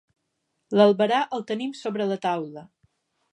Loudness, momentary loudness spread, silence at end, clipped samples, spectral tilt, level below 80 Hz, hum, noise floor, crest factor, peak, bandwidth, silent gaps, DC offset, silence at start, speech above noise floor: -24 LUFS; 12 LU; 0.7 s; under 0.1%; -6 dB/octave; -76 dBFS; none; -77 dBFS; 22 dB; -4 dBFS; 10.5 kHz; none; under 0.1%; 0.7 s; 54 dB